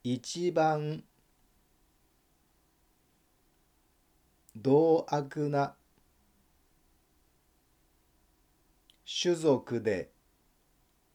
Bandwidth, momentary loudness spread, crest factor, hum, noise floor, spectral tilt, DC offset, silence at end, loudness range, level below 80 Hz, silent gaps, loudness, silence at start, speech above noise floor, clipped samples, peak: 19.5 kHz; 14 LU; 20 dB; none; -70 dBFS; -5.5 dB/octave; under 0.1%; 1.1 s; 9 LU; -72 dBFS; none; -30 LUFS; 0.05 s; 41 dB; under 0.1%; -14 dBFS